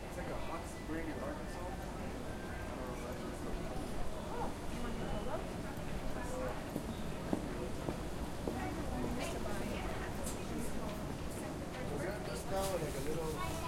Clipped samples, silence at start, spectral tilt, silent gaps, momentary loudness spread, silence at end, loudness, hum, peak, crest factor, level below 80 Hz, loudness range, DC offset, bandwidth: under 0.1%; 0 s; -5.5 dB/octave; none; 4 LU; 0 s; -42 LUFS; none; -18 dBFS; 22 dB; -48 dBFS; 3 LU; under 0.1%; 16.5 kHz